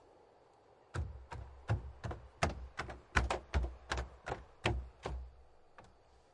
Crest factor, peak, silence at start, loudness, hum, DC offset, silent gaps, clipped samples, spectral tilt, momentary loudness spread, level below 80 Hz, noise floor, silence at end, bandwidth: 28 dB; -14 dBFS; 0.15 s; -41 LUFS; none; under 0.1%; none; under 0.1%; -5 dB/octave; 14 LU; -46 dBFS; -65 dBFS; 0.45 s; 11.5 kHz